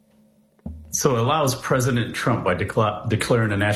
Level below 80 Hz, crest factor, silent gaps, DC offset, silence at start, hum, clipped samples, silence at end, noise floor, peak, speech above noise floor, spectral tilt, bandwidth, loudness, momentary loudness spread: -48 dBFS; 16 dB; none; under 0.1%; 0.65 s; none; under 0.1%; 0 s; -58 dBFS; -6 dBFS; 37 dB; -5 dB/octave; 14 kHz; -21 LUFS; 8 LU